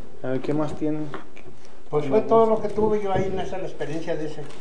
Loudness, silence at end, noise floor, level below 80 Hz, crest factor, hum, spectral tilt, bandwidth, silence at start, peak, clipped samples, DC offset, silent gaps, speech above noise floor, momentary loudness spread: -25 LUFS; 0 s; -47 dBFS; -50 dBFS; 18 dB; none; -7.5 dB/octave; 10 kHz; 0 s; -6 dBFS; under 0.1%; 6%; none; 23 dB; 13 LU